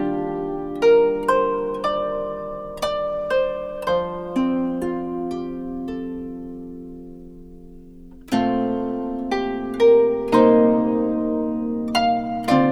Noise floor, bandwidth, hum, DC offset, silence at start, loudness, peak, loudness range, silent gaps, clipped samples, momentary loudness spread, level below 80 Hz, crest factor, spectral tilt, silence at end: -41 dBFS; 13.5 kHz; none; under 0.1%; 0 s; -21 LUFS; -2 dBFS; 10 LU; none; under 0.1%; 15 LU; -46 dBFS; 18 dB; -6.5 dB/octave; 0 s